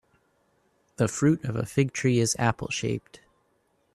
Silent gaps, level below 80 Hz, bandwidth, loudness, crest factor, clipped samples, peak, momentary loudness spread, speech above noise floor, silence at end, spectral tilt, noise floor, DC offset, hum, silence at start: none; -58 dBFS; 13.5 kHz; -26 LUFS; 22 dB; under 0.1%; -6 dBFS; 6 LU; 44 dB; 0.95 s; -5 dB/octave; -70 dBFS; under 0.1%; none; 1 s